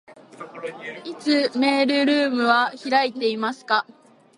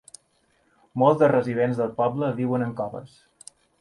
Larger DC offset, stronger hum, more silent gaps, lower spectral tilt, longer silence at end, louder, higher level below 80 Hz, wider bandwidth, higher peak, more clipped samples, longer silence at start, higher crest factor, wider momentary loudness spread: neither; neither; neither; second, -3.5 dB/octave vs -7.5 dB/octave; second, 0.55 s vs 0.75 s; about the same, -21 LUFS vs -23 LUFS; second, -78 dBFS vs -64 dBFS; about the same, 11 kHz vs 11.5 kHz; about the same, -4 dBFS vs -6 dBFS; neither; second, 0.1 s vs 0.95 s; about the same, 20 dB vs 18 dB; about the same, 16 LU vs 14 LU